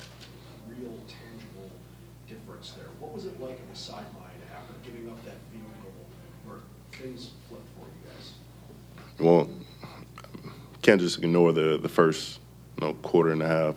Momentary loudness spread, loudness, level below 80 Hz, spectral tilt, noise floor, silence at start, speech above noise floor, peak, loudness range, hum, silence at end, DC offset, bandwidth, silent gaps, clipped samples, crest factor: 25 LU; -25 LUFS; -58 dBFS; -6 dB/octave; -49 dBFS; 0 s; 21 dB; -4 dBFS; 20 LU; none; 0 s; under 0.1%; 16.5 kHz; none; under 0.1%; 26 dB